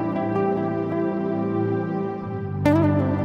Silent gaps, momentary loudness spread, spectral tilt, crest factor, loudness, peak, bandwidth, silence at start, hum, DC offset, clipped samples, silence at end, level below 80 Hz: none; 8 LU; -9.5 dB/octave; 18 dB; -23 LUFS; -6 dBFS; 14 kHz; 0 s; none; under 0.1%; under 0.1%; 0 s; -52 dBFS